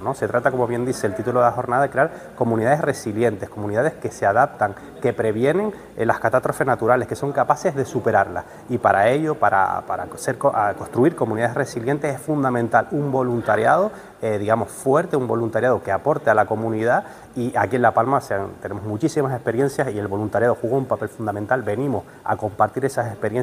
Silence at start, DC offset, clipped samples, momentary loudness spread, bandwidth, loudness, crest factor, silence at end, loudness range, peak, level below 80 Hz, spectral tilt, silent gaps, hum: 0 s; under 0.1%; under 0.1%; 7 LU; 16 kHz; -21 LUFS; 20 dB; 0 s; 2 LU; -2 dBFS; -56 dBFS; -6.5 dB/octave; none; none